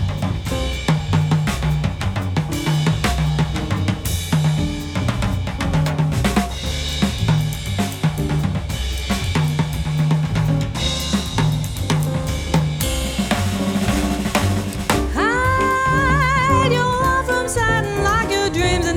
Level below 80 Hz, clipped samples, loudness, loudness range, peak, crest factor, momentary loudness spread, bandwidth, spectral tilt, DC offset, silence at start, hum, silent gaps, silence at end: -28 dBFS; under 0.1%; -19 LUFS; 4 LU; -2 dBFS; 18 dB; 6 LU; 17.5 kHz; -5 dB/octave; under 0.1%; 0 s; none; none; 0 s